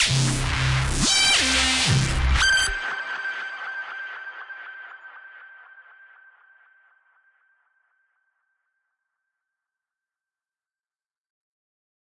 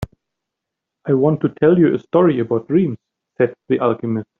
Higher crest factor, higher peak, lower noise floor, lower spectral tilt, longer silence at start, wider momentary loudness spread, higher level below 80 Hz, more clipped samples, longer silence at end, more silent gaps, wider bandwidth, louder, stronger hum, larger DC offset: about the same, 20 dB vs 16 dB; second, -6 dBFS vs -2 dBFS; first, under -90 dBFS vs -82 dBFS; second, -2.5 dB/octave vs -8 dB/octave; about the same, 0 s vs 0 s; first, 22 LU vs 9 LU; first, -36 dBFS vs -52 dBFS; neither; first, 6.25 s vs 0.15 s; neither; first, 11.5 kHz vs 4.1 kHz; second, -21 LUFS vs -17 LUFS; neither; neither